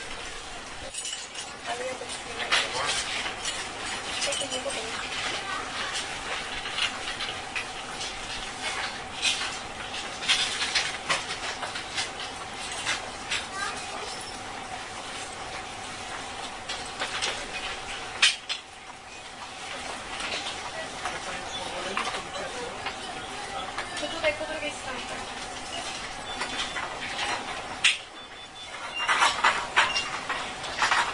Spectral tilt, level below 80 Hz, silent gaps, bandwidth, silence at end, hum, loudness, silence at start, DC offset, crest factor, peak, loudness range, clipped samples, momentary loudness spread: -0.5 dB/octave; -54 dBFS; none; 11 kHz; 0 s; none; -29 LUFS; 0 s; under 0.1%; 26 dB; -6 dBFS; 6 LU; under 0.1%; 12 LU